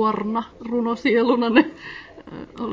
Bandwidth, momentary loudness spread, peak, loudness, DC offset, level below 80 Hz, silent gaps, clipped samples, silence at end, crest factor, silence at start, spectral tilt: 7.6 kHz; 21 LU; -2 dBFS; -21 LUFS; under 0.1%; -56 dBFS; none; under 0.1%; 0 s; 20 dB; 0 s; -6.5 dB/octave